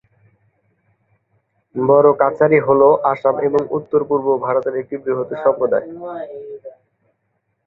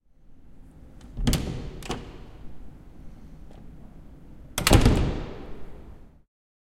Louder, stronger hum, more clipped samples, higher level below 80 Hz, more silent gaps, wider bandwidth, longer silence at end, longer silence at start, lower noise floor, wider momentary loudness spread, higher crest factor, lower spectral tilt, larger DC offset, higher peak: first, -16 LUFS vs -26 LUFS; neither; neither; second, -60 dBFS vs -32 dBFS; neither; second, 4.1 kHz vs 16 kHz; first, 0.95 s vs 0.6 s; first, 1.75 s vs 0.3 s; first, -70 dBFS vs -49 dBFS; second, 18 LU vs 29 LU; second, 18 dB vs 26 dB; first, -10 dB/octave vs -5 dB/octave; neither; about the same, 0 dBFS vs -2 dBFS